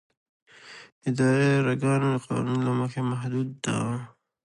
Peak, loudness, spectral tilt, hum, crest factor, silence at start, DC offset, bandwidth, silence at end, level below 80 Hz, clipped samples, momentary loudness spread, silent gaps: -12 dBFS; -26 LUFS; -6.5 dB/octave; none; 14 dB; 0.65 s; under 0.1%; 11.5 kHz; 0.4 s; -66 dBFS; under 0.1%; 18 LU; 0.92-1.01 s